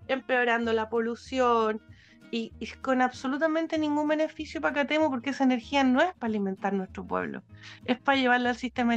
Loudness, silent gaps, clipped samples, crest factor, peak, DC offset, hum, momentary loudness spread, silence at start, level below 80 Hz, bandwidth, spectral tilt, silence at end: -27 LUFS; none; under 0.1%; 18 dB; -10 dBFS; under 0.1%; none; 11 LU; 0 s; -60 dBFS; 8.4 kHz; -5 dB/octave; 0 s